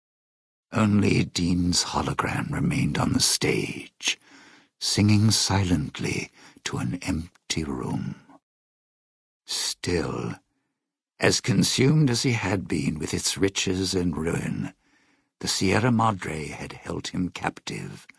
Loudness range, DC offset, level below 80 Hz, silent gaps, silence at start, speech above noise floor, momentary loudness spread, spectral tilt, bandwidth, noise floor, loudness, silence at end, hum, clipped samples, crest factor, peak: 8 LU; under 0.1%; -48 dBFS; 8.43-9.40 s; 0.7 s; 60 dB; 13 LU; -4.5 dB/octave; 11 kHz; -84 dBFS; -25 LUFS; 0.15 s; none; under 0.1%; 24 dB; -2 dBFS